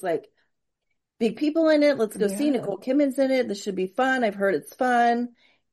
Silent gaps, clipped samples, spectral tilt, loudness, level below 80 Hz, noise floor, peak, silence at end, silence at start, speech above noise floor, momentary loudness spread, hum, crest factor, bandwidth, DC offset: none; under 0.1%; -5 dB/octave; -24 LUFS; -74 dBFS; -80 dBFS; -10 dBFS; 0.45 s; 0.05 s; 56 dB; 8 LU; none; 16 dB; 12.5 kHz; under 0.1%